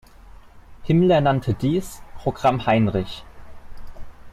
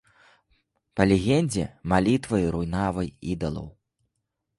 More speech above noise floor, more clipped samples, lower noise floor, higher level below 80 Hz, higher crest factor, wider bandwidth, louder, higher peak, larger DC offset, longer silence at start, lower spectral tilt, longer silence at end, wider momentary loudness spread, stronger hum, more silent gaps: second, 25 dB vs 56 dB; neither; second, -44 dBFS vs -80 dBFS; about the same, -42 dBFS vs -44 dBFS; second, 16 dB vs 22 dB; first, 15 kHz vs 11.5 kHz; first, -21 LUFS vs -25 LUFS; about the same, -6 dBFS vs -4 dBFS; neither; second, 0.25 s vs 0.95 s; about the same, -7.5 dB/octave vs -6.5 dB/octave; second, 0 s vs 0.9 s; first, 18 LU vs 10 LU; neither; neither